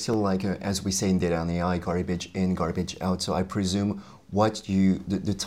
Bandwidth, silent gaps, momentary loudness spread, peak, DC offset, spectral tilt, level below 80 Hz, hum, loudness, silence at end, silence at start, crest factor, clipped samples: 14 kHz; none; 5 LU; -8 dBFS; 0.1%; -5.5 dB/octave; -52 dBFS; none; -27 LUFS; 0 s; 0 s; 18 dB; under 0.1%